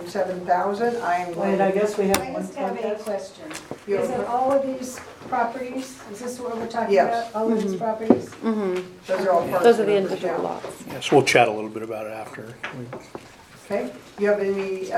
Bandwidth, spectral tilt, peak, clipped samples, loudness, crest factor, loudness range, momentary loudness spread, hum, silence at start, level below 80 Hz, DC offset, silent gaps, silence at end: 18.5 kHz; -5 dB/octave; 0 dBFS; under 0.1%; -23 LUFS; 22 dB; 6 LU; 16 LU; none; 0 s; -60 dBFS; under 0.1%; none; 0 s